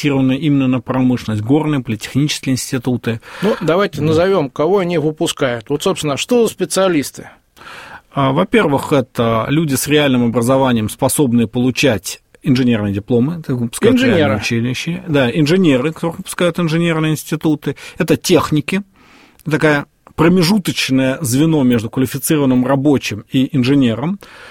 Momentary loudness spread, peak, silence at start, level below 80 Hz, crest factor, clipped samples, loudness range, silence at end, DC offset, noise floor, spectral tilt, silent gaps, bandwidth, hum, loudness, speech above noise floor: 8 LU; 0 dBFS; 0 s; -46 dBFS; 14 dB; under 0.1%; 2 LU; 0 s; under 0.1%; -46 dBFS; -5.5 dB/octave; none; 16.5 kHz; none; -15 LUFS; 31 dB